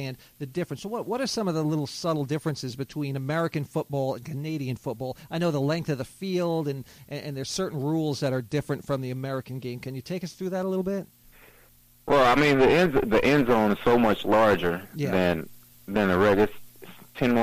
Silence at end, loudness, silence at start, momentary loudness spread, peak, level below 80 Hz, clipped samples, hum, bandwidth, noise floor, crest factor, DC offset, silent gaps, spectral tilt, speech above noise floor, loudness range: 0 s; -26 LUFS; 0 s; 14 LU; -10 dBFS; -52 dBFS; under 0.1%; none; 15.5 kHz; -57 dBFS; 16 dB; under 0.1%; none; -6 dB/octave; 31 dB; 9 LU